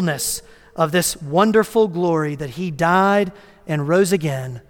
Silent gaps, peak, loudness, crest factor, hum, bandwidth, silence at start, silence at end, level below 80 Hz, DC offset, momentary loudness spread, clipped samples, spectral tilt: none; -2 dBFS; -19 LUFS; 16 dB; none; 18 kHz; 0 s; 0.1 s; -52 dBFS; under 0.1%; 11 LU; under 0.1%; -5 dB/octave